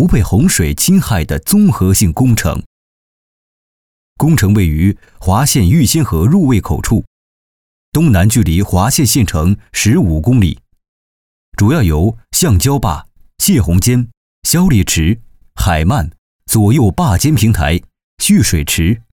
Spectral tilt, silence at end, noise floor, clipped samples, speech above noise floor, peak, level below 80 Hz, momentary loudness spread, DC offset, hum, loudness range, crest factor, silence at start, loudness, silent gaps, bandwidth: -5 dB/octave; 0.15 s; under -90 dBFS; under 0.1%; over 79 dB; 0 dBFS; -26 dBFS; 7 LU; 0.6%; none; 2 LU; 12 dB; 0 s; -12 LUFS; 2.66-4.16 s, 7.07-7.92 s, 10.88-11.52 s, 14.17-14.42 s, 16.18-16.39 s, 18.04-18.17 s; over 20 kHz